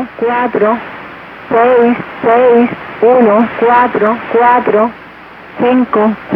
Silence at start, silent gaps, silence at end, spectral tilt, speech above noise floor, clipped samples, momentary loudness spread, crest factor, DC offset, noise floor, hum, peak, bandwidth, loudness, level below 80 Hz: 0 s; none; 0 s; -8.5 dB/octave; 23 dB; under 0.1%; 9 LU; 10 dB; under 0.1%; -33 dBFS; none; 0 dBFS; 5.2 kHz; -10 LUFS; -50 dBFS